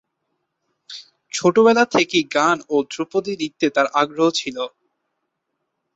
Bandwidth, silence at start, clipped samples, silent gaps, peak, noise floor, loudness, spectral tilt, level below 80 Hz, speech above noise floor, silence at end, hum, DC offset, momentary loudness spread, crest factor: 8.2 kHz; 0.9 s; under 0.1%; none; -4 dBFS; -76 dBFS; -19 LUFS; -4 dB/octave; -66 dBFS; 58 dB; 1.3 s; none; under 0.1%; 16 LU; 18 dB